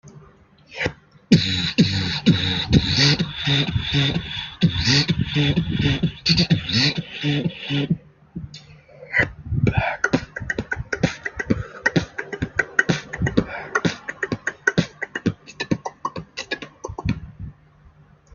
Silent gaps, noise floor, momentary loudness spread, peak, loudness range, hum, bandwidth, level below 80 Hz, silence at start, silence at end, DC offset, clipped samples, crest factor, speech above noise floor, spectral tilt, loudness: none; -51 dBFS; 13 LU; 0 dBFS; 7 LU; none; 7.4 kHz; -40 dBFS; 0.05 s; 0.8 s; under 0.1%; under 0.1%; 22 dB; 31 dB; -5 dB/octave; -22 LUFS